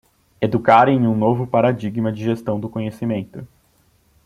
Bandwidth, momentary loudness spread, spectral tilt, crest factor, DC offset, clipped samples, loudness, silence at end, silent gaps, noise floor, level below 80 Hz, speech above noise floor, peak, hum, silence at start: 12 kHz; 13 LU; -8.5 dB/octave; 18 dB; under 0.1%; under 0.1%; -19 LUFS; 0.8 s; none; -59 dBFS; -56 dBFS; 41 dB; 0 dBFS; none; 0.4 s